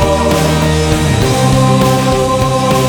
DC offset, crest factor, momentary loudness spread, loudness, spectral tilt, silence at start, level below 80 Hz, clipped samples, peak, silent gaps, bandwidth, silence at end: under 0.1%; 10 dB; 2 LU; -11 LUFS; -5.5 dB/octave; 0 s; -24 dBFS; under 0.1%; 0 dBFS; none; over 20 kHz; 0 s